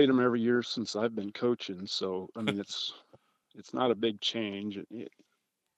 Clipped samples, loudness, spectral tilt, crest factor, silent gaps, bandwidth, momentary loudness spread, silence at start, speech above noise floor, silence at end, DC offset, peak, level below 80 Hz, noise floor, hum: under 0.1%; -32 LUFS; -5 dB/octave; 20 dB; none; 11 kHz; 12 LU; 0 s; 49 dB; 0.7 s; under 0.1%; -12 dBFS; -82 dBFS; -80 dBFS; none